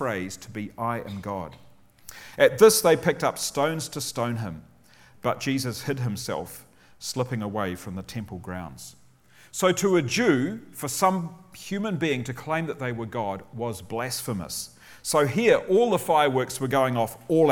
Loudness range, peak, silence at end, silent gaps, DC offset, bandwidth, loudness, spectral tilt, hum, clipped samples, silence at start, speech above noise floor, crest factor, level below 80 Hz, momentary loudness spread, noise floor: 8 LU; -4 dBFS; 0 s; none; under 0.1%; 18.5 kHz; -25 LUFS; -4.5 dB/octave; none; under 0.1%; 0 s; 30 dB; 22 dB; -58 dBFS; 15 LU; -55 dBFS